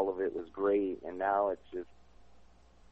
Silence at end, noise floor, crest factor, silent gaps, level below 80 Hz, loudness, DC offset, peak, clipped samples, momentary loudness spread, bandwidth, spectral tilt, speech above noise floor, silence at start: 1.1 s; -61 dBFS; 18 dB; none; -64 dBFS; -34 LUFS; 0.1%; -18 dBFS; under 0.1%; 14 LU; 4.7 kHz; -8 dB/octave; 28 dB; 0 s